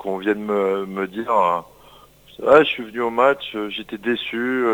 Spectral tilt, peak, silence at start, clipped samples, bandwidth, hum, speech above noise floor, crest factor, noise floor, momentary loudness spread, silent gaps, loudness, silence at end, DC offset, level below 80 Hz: -6 dB/octave; 0 dBFS; 0 s; under 0.1%; over 20 kHz; none; 29 dB; 20 dB; -48 dBFS; 12 LU; none; -20 LUFS; 0 s; under 0.1%; -58 dBFS